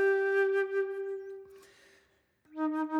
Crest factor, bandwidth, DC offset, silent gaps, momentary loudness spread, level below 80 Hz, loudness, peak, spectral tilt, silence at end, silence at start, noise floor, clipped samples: 12 dB; 7 kHz; under 0.1%; none; 19 LU; -84 dBFS; -31 LUFS; -20 dBFS; -4.5 dB/octave; 0 s; 0 s; -69 dBFS; under 0.1%